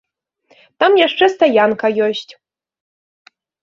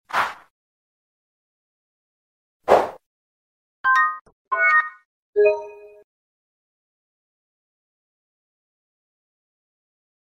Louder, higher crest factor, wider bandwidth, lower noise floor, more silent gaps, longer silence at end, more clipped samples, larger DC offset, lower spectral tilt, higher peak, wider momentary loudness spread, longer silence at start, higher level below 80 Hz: first, -14 LUFS vs -20 LUFS; second, 16 dB vs 26 dB; second, 7.4 kHz vs 15.5 kHz; second, -57 dBFS vs under -90 dBFS; second, none vs 0.50-2.60 s, 3.06-3.84 s, 4.21-4.25 s, 4.32-4.45 s, 5.05-5.33 s; second, 1.3 s vs 4.4 s; neither; neither; about the same, -4.5 dB/octave vs -3.5 dB/octave; about the same, 0 dBFS vs 0 dBFS; second, 7 LU vs 16 LU; first, 0.8 s vs 0.1 s; about the same, -64 dBFS vs -66 dBFS